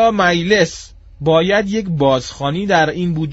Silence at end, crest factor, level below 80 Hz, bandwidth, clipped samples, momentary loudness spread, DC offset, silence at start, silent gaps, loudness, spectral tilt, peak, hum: 0 s; 16 dB; -42 dBFS; 8 kHz; under 0.1%; 8 LU; under 0.1%; 0 s; none; -16 LUFS; -4 dB/octave; 0 dBFS; none